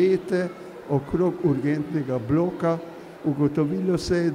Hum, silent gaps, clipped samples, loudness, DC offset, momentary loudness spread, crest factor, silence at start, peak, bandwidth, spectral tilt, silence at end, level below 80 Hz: none; none; under 0.1%; -25 LUFS; under 0.1%; 8 LU; 14 dB; 0 s; -10 dBFS; 12 kHz; -7.5 dB/octave; 0 s; -50 dBFS